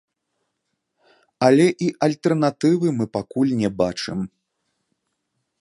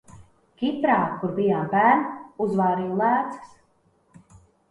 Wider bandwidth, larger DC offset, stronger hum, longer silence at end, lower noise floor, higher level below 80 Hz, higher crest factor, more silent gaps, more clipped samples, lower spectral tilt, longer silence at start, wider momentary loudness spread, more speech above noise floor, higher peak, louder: about the same, 11.5 kHz vs 11 kHz; neither; neither; about the same, 1.35 s vs 1.25 s; first, -76 dBFS vs -64 dBFS; first, -58 dBFS vs -64 dBFS; about the same, 20 dB vs 20 dB; neither; neither; second, -6.5 dB/octave vs -8 dB/octave; first, 1.4 s vs 0.1 s; about the same, 11 LU vs 10 LU; first, 57 dB vs 42 dB; first, -2 dBFS vs -6 dBFS; first, -20 LUFS vs -23 LUFS